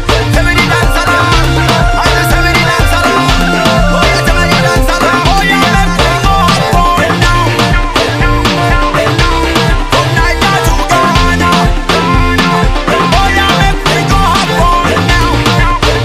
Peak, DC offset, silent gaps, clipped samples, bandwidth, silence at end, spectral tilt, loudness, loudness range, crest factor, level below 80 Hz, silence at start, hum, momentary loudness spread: 0 dBFS; 0.3%; none; 0.5%; 16 kHz; 0 s; -4.5 dB/octave; -9 LUFS; 1 LU; 8 dB; -14 dBFS; 0 s; none; 2 LU